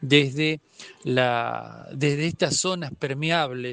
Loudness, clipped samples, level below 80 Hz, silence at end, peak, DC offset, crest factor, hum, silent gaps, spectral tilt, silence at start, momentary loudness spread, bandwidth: -24 LUFS; under 0.1%; -64 dBFS; 0 s; -2 dBFS; under 0.1%; 22 dB; none; none; -4 dB/octave; 0 s; 13 LU; 9.6 kHz